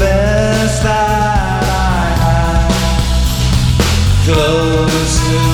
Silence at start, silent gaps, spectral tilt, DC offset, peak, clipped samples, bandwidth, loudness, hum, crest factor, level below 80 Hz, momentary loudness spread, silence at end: 0 s; none; -5 dB/octave; under 0.1%; 0 dBFS; under 0.1%; 18.5 kHz; -13 LUFS; none; 10 dB; -18 dBFS; 2 LU; 0 s